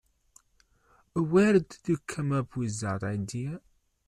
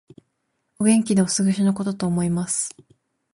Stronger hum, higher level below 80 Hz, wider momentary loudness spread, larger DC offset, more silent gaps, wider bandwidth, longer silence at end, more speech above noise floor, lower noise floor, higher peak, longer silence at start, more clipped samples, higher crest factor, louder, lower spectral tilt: neither; about the same, -60 dBFS vs -58 dBFS; first, 13 LU vs 6 LU; neither; neither; about the same, 12 kHz vs 11.5 kHz; second, 0.5 s vs 0.65 s; second, 39 dB vs 53 dB; second, -67 dBFS vs -74 dBFS; second, -10 dBFS vs -4 dBFS; first, 1.15 s vs 0.8 s; neither; about the same, 18 dB vs 18 dB; second, -29 LUFS vs -21 LUFS; first, -6.5 dB/octave vs -5 dB/octave